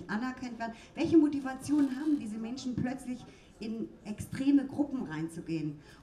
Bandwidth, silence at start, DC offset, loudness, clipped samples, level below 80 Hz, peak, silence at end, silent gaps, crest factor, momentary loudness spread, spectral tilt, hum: 13 kHz; 0 s; under 0.1%; -33 LUFS; under 0.1%; -62 dBFS; -14 dBFS; 0 s; none; 18 dB; 14 LU; -6.5 dB/octave; none